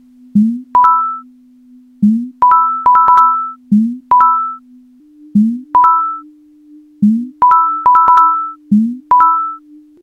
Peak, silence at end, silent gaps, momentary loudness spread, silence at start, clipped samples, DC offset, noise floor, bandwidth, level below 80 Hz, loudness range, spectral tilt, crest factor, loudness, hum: 0 dBFS; 0.45 s; none; 10 LU; 0.35 s; under 0.1%; under 0.1%; -43 dBFS; 6.2 kHz; -54 dBFS; 3 LU; -8.5 dB/octave; 12 dB; -11 LUFS; none